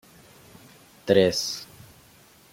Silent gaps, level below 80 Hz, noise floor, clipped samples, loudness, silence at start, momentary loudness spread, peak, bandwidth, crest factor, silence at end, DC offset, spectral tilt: none; -64 dBFS; -54 dBFS; under 0.1%; -23 LUFS; 1.05 s; 20 LU; -4 dBFS; 16.5 kHz; 24 dB; 0.9 s; under 0.1%; -4 dB/octave